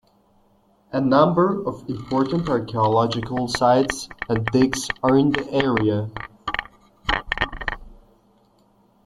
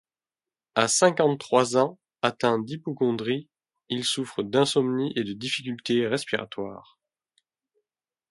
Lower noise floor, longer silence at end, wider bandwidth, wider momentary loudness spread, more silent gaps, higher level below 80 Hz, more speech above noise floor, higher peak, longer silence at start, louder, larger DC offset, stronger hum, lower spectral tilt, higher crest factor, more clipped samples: second, -59 dBFS vs under -90 dBFS; second, 1.1 s vs 1.5 s; about the same, 12.5 kHz vs 11.5 kHz; first, 12 LU vs 9 LU; neither; first, -42 dBFS vs -70 dBFS; second, 39 dB vs over 65 dB; about the same, -2 dBFS vs -4 dBFS; first, 0.9 s vs 0.75 s; first, -21 LUFS vs -25 LUFS; neither; neither; first, -5.5 dB/octave vs -4 dB/octave; about the same, 20 dB vs 22 dB; neither